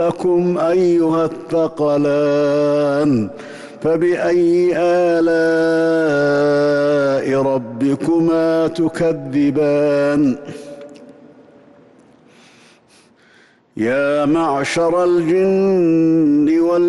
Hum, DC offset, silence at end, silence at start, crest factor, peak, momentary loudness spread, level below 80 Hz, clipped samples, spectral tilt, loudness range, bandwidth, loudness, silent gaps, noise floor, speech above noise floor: none; under 0.1%; 0 s; 0 s; 8 dB; -8 dBFS; 5 LU; -54 dBFS; under 0.1%; -7 dB/octave; 7 LU; 11.5 kHz; -16 LUFS; none; -51 dBFS; 36 dB